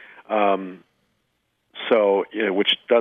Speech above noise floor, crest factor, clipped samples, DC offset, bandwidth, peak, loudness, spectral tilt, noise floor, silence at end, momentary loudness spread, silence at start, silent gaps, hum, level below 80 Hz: 52 dB; 16 dB; under 0.1%; under 0.1%; 4.3 kHz; -6 dBFS; -21 LUFS; -6.5 dB/octave; -72 dBFS; 0 s; 15 LU; 0.3 s; none; none; -76 dBFS